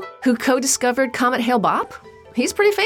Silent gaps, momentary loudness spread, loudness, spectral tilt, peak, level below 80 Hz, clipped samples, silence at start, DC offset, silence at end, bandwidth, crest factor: none; 6 LU; -19 LUFS; -3 dB/octave; -6 dBFS; -58 dBFS; under 0.1%; 0 s; under 0.1%; 0 s; 18 kHz; 14 dB